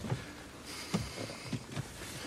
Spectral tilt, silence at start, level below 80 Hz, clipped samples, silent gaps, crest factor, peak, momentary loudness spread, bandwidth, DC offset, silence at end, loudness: -4.5 dB/octave; 0 s; -56 dBFS; under 0.1%; none; 20 dB; -20 dBFS; 8 LU; 16 kHz; under 0.1%; 0 s; -41 LUFS